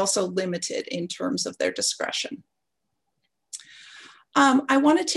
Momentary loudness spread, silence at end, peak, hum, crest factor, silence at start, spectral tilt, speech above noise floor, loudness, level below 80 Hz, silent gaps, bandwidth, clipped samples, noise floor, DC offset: 21 LU; 0 s; -6 dBFS; none; 20 dB; 0 s; -3 dB/octave; 58 dB; -24 LUFS; -70 dBFS; none; 12.5 kHz; under 0.1%; -81 dBFS; under 0.1%